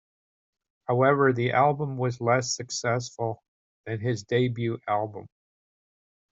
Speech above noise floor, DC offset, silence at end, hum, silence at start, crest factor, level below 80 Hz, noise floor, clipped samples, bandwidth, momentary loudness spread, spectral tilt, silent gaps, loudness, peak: over 65 dB; under 0.1%; 1.1 s; none; 0.9 s; 20 dB; -66 dBFS; under -90 dBFS; under 0.1%; 8.2 kHz; 14 LU; -5.5 dB/octave; 3.48-3.84 s; -26 LUFS; -8 dBFS